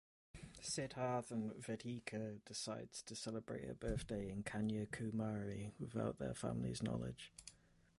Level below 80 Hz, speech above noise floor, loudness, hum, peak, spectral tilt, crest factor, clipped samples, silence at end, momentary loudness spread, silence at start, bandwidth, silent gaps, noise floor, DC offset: -62 dBFS; 25 dB; -46 LUFS; none; -28 dBFS; -5 dB/octave; 16 dB; under 0.1%; 0.45 s; 8 LU; 0.35 s; 11.5 kHz; none; -70 dBFS; under 0.1%